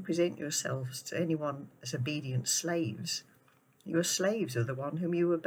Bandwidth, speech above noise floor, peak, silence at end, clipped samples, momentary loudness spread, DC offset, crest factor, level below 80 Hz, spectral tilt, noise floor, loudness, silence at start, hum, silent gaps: over 20 kHz; 33 dB; -18 dBFS; 0 s; under 0.1%; 8 LU; under 0.1%; 16 dB; -80 dBFS; -4 dB/octave; -66 dBFS; -33 LUFS; 0 s; none; none